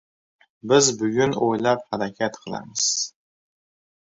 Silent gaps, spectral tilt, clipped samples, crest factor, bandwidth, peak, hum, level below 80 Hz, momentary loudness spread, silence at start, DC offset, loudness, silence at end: none; -3 dB/octave; under 0.1%; 20 dB; 8 kHz; -4 dBFS; none; -62 dBFS; 13 LU; 0.65 s; under 0.1%; -22 LUFS; 1.05 s